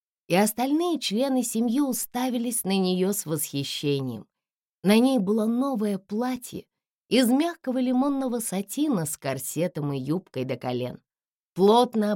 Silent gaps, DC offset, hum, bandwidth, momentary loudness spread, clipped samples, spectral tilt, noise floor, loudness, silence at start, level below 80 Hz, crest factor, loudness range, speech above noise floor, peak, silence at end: 4.56-4.60 s, 4.69-4.83 s, 6.93-7.06 s, 11.28-11.36 s, 11.45-11.53 s; under 0.1%; none; 17 kHz; 9 LU; under 0.1%; -5 dB/octave; under -90 dBFS; -25 LUFS; 0.3 s; -70 dBFS; 16 dB; 3 LU; over 65 dB; -8 dBFS; 0 s